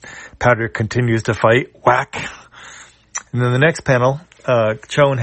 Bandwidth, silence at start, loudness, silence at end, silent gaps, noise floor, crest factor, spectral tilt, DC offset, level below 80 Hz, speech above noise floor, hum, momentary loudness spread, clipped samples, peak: 8.8 kHz; 0.05 s; -17 LUFS; 0 s; none; -41 dBFS; 16 dB; -6 dB/octave; under 0.1%; -46 dBFS; 25 dB; none; 17 LU; under 0.1%; 0 dBFS